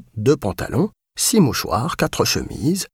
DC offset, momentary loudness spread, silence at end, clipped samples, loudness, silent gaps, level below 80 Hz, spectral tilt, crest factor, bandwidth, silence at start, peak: under 0.1%; 6 LU; 0.1 s; under 0.1%; -20 LUFS; none; -42 dBFS; -4.5 dB/octave; 16 dB; 18 kHz; 0.15 s; -4 dBFS